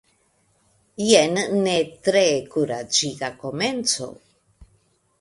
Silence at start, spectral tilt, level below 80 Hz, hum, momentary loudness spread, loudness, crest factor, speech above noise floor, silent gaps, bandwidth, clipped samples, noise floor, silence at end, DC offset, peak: 1 s; -3 dB/octave; -60 dBFS; none; 12 LU; -21 LUFS; 22 dB; 43 dB; none; 11.5 kHz; under 0.1%; -64 dBFS; 0.55 s; under 0.1%; -2 dBFS